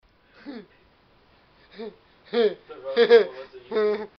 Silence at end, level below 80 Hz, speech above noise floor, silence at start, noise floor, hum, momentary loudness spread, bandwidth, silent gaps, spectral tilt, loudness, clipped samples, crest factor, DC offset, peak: 0.15 s; -68 dBFS; 36 dB; 0.45 s; -59 dBFS; none; 24 LU; 6 kHz; none; -1.5 dB/octave; -22 LUFS; under 0.1%; 22 dB; under 0.1%; -4 dBFS